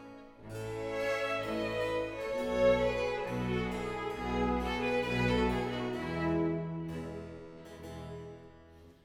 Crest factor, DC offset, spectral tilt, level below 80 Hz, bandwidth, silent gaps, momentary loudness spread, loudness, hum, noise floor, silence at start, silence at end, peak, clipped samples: 18 dB; under 0.1%; -6.5 dB/octave; -48 dBFS; 17 kHz; none; 17 LU; -33 LUFS; none; -56 dBFS; 0 s; 0.1 s; -16 dBFS; under 0.1%